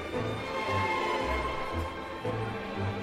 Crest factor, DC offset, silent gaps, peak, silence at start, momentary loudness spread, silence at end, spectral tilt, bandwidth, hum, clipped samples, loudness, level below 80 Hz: 14 dB; under 0.1%; none; -18 dBFS; 0 s; 6 LU; 0 s; -5.5 dB/octave; 16 kHz; none; under 0.1%; -32 LUFS; -46 dBFS